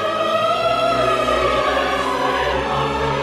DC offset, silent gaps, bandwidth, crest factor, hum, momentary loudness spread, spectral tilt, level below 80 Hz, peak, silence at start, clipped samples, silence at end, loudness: under 0.1%; none; 15.5 kHz; 12 dB; none; 3 LU; -4.5 dB/octave; -38 dBFS; -6 dBFS; 0 s; under 0.1%; 0 s; -18 LUFS